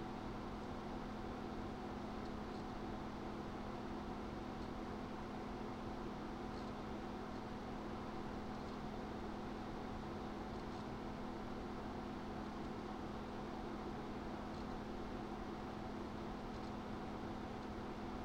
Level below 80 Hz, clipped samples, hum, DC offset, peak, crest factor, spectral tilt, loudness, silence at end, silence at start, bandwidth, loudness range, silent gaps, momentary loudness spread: -56 dBFS; under 0.1%; none; under 0.1%; -32 dBFS; 14 dB; -6.5 dB/octave; -48 LUFS; 0 s; 0 s; 16 kHz; 0 LU; none; 1 LU